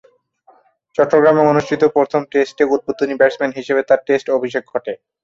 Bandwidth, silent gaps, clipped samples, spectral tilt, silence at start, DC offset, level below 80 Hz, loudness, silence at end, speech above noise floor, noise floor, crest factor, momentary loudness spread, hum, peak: 7.6 kHz; none; under 0.1%; -6.5 dB/octave; 1 s; under 0.1%; -58 dBFS; -16 LUFS; 0.3 s; 37 dB; -53 dBFS; 16 dB; 10 LU; none; 0 dBFS